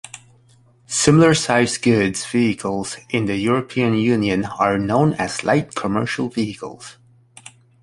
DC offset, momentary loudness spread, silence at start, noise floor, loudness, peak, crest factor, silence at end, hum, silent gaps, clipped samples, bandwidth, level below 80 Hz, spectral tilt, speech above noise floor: under 0.1%; 11 LU; 0.15 s; -53 dBFS; -19 LUFS; -2 dBFS; 18 dB; 0.9 s; none; none; under 0.1%; 11.5 kHz; -50 dBFS; -5 dB/octave; 35 dB